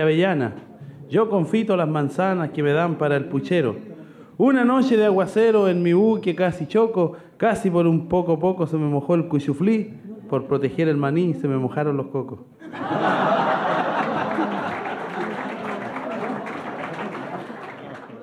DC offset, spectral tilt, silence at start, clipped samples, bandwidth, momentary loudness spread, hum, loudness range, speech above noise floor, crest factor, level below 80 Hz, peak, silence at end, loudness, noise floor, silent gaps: under 0.1%; -8 dB/octave; 0 s; under 0.1%; 11.5 kHz; 15 LU; none; 7 LU; 21 dB; 14 dB; -60 dBFS; -8 dBFS; 0 s; -22 LUFS; -41 dBFS; none